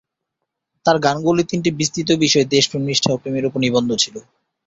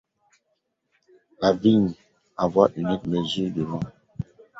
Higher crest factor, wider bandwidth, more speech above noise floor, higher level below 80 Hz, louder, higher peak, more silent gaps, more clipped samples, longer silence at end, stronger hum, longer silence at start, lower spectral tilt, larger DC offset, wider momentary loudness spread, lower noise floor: second, 16 dB vs 22 dB; about the same, 8.2 kHz vs 7.8 kHz; first, 61 dB vs 53 dB; about the same, -54 dBFS vs -54 dBFS; first, -18 LUFS vs -23 LUFS; about the same, -2 dBFS vs -2 dBFS; neither; neither; about the same, 0.45 s vs 0.35 s; neither; second, 0.85 s vs 1.4 s; second, -4 dB/octave vs -7 dB/octave; neither; second, 6 LU vs 17 LU; first, -79 dBFS vs -75 dBFS